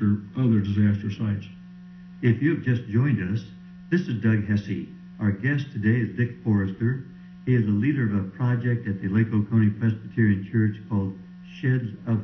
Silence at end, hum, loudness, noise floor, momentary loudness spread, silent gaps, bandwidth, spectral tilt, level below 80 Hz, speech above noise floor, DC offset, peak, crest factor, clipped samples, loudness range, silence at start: 0 s; none; -25 LUFS; -43 dBFS; 11 LU; none; 6.2 kHz; -9.5 dB/octave; -50 dBFS; 20 dB; under 0.1%; -8 dBFS; 16 dB; under 0.1%; 2 LU; 0 s